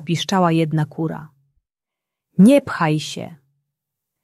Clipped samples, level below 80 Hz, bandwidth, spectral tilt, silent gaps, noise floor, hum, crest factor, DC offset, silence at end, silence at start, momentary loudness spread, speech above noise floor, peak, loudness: under 0.1%; -62 dBFS; 13 kHz; -6.5 dB/octave; none; -86 dBFS; none; 16 dB; under 0.1%; 0.9 s; 0 s; 18 LU; 68 dB; -4 dBFS; -18 LUFS